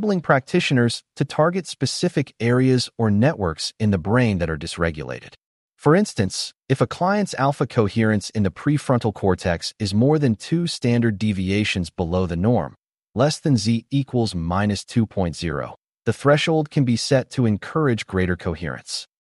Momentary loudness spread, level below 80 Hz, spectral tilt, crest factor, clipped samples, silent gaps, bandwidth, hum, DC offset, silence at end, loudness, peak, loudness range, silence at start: 8 LU; -46 dBFS; -6 dB/octave; 16 dB; under 0.1%; 5.46-5.69 s, 12.78-12.82 s; 11.5 kHz; none; under 0.1%; 0.2 s; -21 LUFS; -4 dBFS; 2 LU; 0 s